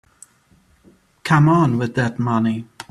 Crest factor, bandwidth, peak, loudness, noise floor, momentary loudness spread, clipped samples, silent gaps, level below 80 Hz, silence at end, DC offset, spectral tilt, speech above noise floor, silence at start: 18 dB; 11.5 kHz; -2 dBFS; -18 LUFS; -56 dBFS; 11 LU; under 0.1%; none; -54 dBFS; 0.25 s; under 0.1%; -7.5 dB/octave; 40 dB; 1.25 s